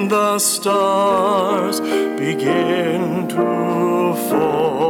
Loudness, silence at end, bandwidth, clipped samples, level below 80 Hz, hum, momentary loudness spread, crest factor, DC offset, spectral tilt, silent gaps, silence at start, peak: -17 LUFS; 0 s; 18 kHz; under 0.1%; -60 dBFS; none; 4 LU; 10 dB; under 0.1%; -4.5 dB/octave; none; 0 s; -6 dBFS